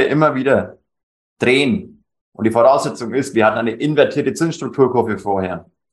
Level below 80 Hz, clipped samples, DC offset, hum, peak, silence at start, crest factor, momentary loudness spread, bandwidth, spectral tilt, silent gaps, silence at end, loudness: -58 dBFS; under 0.1%; under 0.1%; none; 0 dBFS; 0 s; 16 dB; 8 LU; 12.5 kHz; -6 dB/octave; 1.03-1.36 s, 2.21-2.32 s; 0.3 s; -17 LUFS